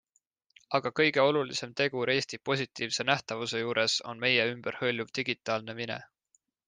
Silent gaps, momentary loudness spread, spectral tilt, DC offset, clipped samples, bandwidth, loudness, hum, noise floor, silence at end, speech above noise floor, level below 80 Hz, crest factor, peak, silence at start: none; 8 LU; -3.5 dB/octave; under 0.1%; under 0.1%; 10 kHz; -29 LUFS; none; -74 dBFS; 0.65 s; 44 dB; -74 dBFS; 24 dB; -8 dBFS; 0.7 s